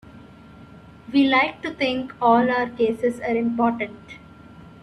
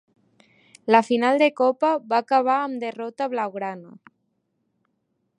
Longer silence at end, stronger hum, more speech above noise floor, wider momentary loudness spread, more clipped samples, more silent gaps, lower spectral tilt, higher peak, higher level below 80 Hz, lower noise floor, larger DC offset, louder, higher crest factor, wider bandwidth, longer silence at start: second, 0.15 s vs 1.55 s; neither; second, 24 dB vs 52 dB; about the same, 13 LU vs 13 LU; neither; neither; about the same, -6 dB/octave vs -5 dB/octave; second, -6 dBFS vs 0 dBFS; first, -56 dBFS vs -82 dBFS; second, -45 dBFS vs -73 dBFS; neither; about the same, -21 LUFS vs -22 LUFS; about the same, 18 dB vs 22 dB; about the same, 11 kHz vs 11 kHz; second, 0.05 s vs 0.85 s